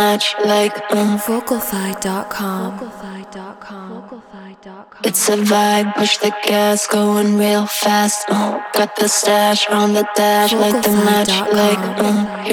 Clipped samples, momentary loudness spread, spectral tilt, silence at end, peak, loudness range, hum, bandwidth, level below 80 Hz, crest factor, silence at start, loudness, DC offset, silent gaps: under 0.1%; 18 LU; -3.5 dB/octave; 0 s; -2 dBFS; 9 LU; none; 19.5 kHz; -58 dBFS; 14 dB; 0 s; -15 LUFS; under 0.1%; none